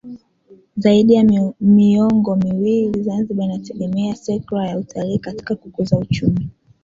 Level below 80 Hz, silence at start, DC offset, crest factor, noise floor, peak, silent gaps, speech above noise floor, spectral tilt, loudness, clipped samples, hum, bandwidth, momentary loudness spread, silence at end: -48 dBFS; 0.05 s; under 0.1%; 14 dB; -49 dBFS; -2 dBFS; none; 33 dB; -8 dB/octave; -17 LUFS; under 0.1%; none; 7.6 kHz; 12 LU; 0.35 s